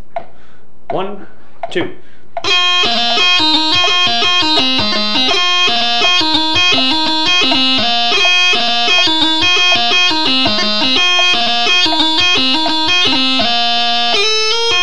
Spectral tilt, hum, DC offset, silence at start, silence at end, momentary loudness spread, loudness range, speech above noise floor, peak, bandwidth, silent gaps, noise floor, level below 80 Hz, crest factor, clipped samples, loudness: -1.5 dB/octave; none; 10%; 0.15 s; 0 s; 11 LU; 2 LU; 33 dB; 0 dBFS; 12 kHz; none; -47 dBFS; -52 dBFS; 14 dB; under 0.1%; -10 LUFS